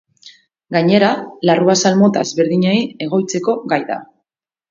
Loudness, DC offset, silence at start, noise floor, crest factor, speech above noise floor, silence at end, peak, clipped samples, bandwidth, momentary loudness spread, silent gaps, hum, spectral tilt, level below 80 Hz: -15 LUFS; under 0.1%; 0.25 s; -79 dBFS; 16 dB; 64 dB; 0.65 s; 0 dBFS; under 0.1%; 7.6 kHz; 7 LU; none; none; -5 dB/octave; -62 dBFS